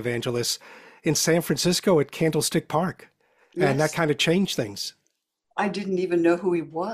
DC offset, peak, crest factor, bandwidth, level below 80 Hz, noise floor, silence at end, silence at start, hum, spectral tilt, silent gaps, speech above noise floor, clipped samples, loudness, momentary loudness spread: under 0.1%; -6 dBFS; 18 dB; 16 kHz; -60 dBFS; -75 dBFS; 0 s; 0 s; none; -4.5 dB/octave; none; 51 dB; under 0.1%; -24 LUFS; 10 LU